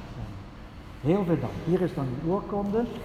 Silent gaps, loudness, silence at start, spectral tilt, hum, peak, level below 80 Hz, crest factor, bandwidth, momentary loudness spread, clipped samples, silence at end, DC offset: none; -28 LUFS; 0 s; -9 dB/octave; none; -12 dBFS; -46 dBFS; 18 dB; 13.5 kHz; 18 LU; under 0.1%; 0 s; under 0.1%